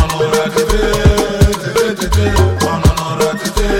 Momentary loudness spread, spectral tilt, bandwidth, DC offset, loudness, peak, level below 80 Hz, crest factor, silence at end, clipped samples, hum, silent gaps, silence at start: 3 LU; -5 dB/octave; 17 kHz; under 0.1%; -14 LUFS; 0 dBFS; -18 dBFS; 12 dB; 0 s; under 0.1%; none; none; 0 s